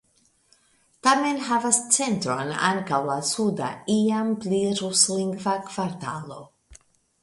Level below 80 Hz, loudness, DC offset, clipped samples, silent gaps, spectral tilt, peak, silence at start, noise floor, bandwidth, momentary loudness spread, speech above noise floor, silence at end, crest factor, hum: -64 dBFS; -23 LUFS; under 0.1%; under 0.1%; none; -3 dB/octave; -2 dBFS; 1.05 s; -64 dBFS; 11.5 kHz; 10 LU; 40 dB; 0.5 s; 22 dB; none